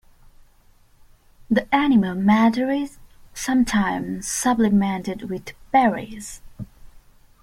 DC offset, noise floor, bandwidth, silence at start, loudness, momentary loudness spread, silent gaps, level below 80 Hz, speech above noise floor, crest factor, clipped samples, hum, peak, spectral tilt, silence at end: under 0.1%; -54 dBFS; 15.5 kHz; 1.5 s; -21 LUFS; 19 LU; none; -48 dBFS; 34 dB; 18 dB; under 0.1%; none; -4 dBFS; -5 dB/octave; 0.45 s